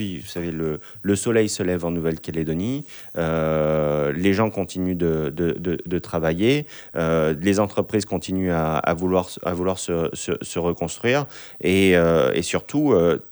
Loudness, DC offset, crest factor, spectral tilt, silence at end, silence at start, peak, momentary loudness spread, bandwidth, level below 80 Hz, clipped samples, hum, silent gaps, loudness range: -22 LUFS; under 0.1%; 16 dB; -5.5 dB/octave; 0 s; 0 s; -4 dBFS; 9 LU; over 20 kHz; -46 dBFS; under 0.1%; none; none; 2 LU